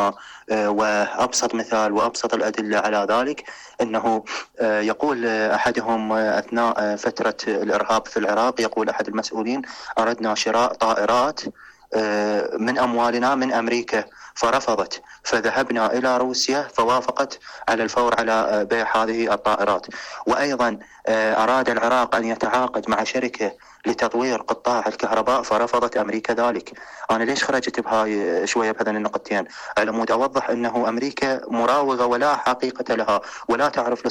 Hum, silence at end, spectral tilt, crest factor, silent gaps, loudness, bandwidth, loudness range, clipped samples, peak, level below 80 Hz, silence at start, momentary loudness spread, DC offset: none; 0 s; -3.5 dB/octave; 10 dB; none; -21 LUFS; 16 kHz; 2 LU; under 0.1%; -10 dBFS; -58 dBFS; 0 s; 6 LU; under 0.1%